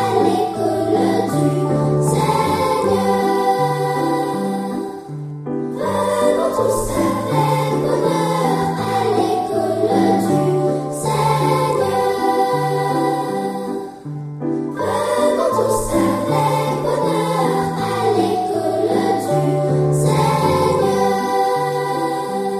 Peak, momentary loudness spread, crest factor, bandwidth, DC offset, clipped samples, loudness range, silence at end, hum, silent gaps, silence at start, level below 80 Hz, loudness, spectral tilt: -2 dBFS; 6 LU; 14 dB; 15 kHz; under 0.1%; under 0.1%; 3 LU; 0 s; none; none; 0 s; -44 dBFS; -18 LUFS; -6 dB/octave